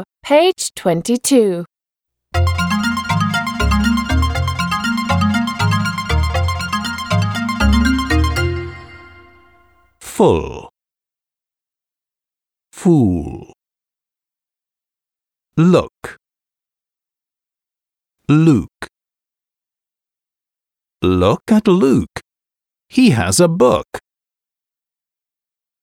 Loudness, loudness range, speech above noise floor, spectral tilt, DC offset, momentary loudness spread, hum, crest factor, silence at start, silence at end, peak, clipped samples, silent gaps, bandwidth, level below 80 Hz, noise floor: -16 LUFS; 6 LU; 76 dB; -5.5 dB/octave; under 0.1%; 17 LU; none; 18 dB; 0 s; 1.85 s; 0 dBFS; under 0.1%; none; 19.5 kHz; -30 dBFS; -89 dBFS